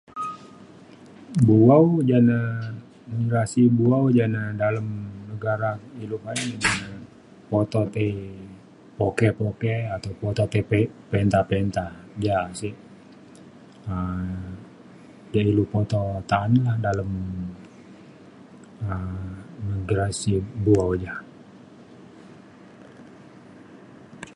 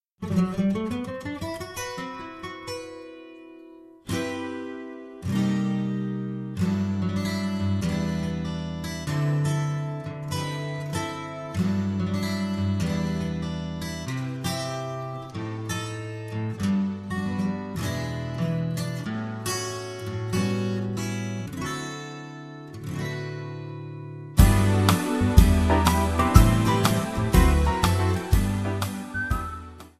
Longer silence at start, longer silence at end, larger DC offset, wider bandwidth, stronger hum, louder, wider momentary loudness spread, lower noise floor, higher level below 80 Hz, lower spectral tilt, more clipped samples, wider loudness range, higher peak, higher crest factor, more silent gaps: about the same, 0.15 s vs 0.2 s; about the same, 0.05 s vs 0.1 s; neither; second, 11.5 kHz vs 14 kHz; neither; first, -23 LUFS vs -26 LUFS; about the same, 17 LU vs 15 LU; about the same, -47 dBFS vs -47 dBFS; second, -46 dBFS vs -32 dBFS; about the same, -7 dB/octave vs -6 dB/octave; neither; about the same, 9 LU vs 11 LU; about the same, -2 dBFS vs 0 dBFS; about the same, 22 dB vs 24 dB; neither